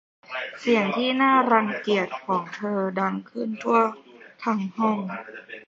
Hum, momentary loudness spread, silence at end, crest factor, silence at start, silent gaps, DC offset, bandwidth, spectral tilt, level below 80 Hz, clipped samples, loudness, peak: none; 14 LU; 0.05 s; 20 dB; 0.3 s; none; under 0.1%; 7.6 kHz; -6 dB/octave; -74 dBFS; under 0.1%; -24 LUFS; -6 dBFS